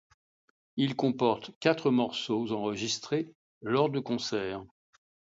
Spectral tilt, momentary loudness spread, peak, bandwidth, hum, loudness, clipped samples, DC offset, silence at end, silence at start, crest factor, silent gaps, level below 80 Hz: -5 dB/octave; 10 LU; -8 dBFS; 7.8 kHz; none; -30 LUFS; under 0.1%; under 0.1%; 0.65 s; 0.75 s; 22 dB; 1.55-1.61 s, 3.35-3.61 s; -70 dBFS